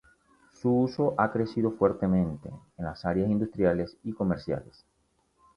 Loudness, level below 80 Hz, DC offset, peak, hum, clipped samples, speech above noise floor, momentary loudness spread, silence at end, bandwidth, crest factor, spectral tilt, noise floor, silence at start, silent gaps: -28 LUFS; -52 dBFS; under 0.1%; -8 dBFS; none; under 0.1%; 42 dB; 10 LU; 0.95 s; 6.8 kHz; 20 dB; -9 dB/octave; -70 dBFS; 0.65 s; none